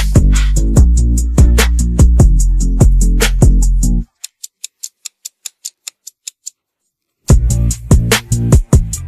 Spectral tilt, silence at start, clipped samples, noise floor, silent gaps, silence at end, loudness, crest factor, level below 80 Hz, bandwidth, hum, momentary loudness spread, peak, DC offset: -5 dB/octave; 0 s; under 0.1%; -73 dBFS; none; 0 s; -12 LUFS; 12 dB; -12 dBFS; 14.5 kHz; none; 18 LU; 0 dBFS; under 0.1%